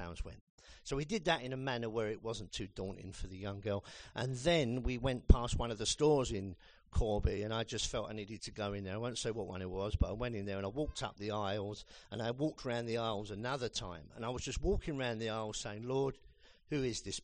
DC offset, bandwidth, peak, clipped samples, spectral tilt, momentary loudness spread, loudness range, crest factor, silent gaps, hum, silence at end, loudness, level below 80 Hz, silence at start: under 0.1%; 10 kHz; -10 dBFS; under 0.1%; -5 dB/octave; 12 LU; 5 LU; 28 dB; 0.41-0.58 s; none; 0 s; -38 LUFS; -44 dBFS; 0 s